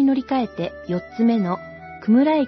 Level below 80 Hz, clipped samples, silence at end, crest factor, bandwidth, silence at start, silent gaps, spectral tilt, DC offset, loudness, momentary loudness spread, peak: -56 dBFS; under 0.1%; 0 s; 12 dB; 6 kHz; 0 s; none; -9 dB/octave; under 0.1%; -22 LUFS; 12 LU; -8 dBFS